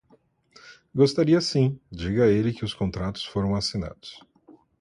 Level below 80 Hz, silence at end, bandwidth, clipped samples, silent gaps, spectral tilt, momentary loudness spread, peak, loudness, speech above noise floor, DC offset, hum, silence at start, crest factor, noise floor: -46 dBFS; 0.65 s; 11.5 kHz; under 0.1%; none; -6.5 dB/octave; 13 LU; -6 dBFS; -24 LUFS; 38 dB; under 0.1%; none; 0.65 s; 18 dB; -62 dBFS